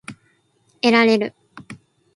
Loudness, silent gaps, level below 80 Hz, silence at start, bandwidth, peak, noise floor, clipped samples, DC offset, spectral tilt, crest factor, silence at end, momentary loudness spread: -17 LUFS; none; -66 dBFS; 0.1 s; 11.5 kHz; 0 dBFS; -62 dBFS; under 0.1%; under 0.1%; -5 dB/octave; 22 dB; 0.4 s; 25 LU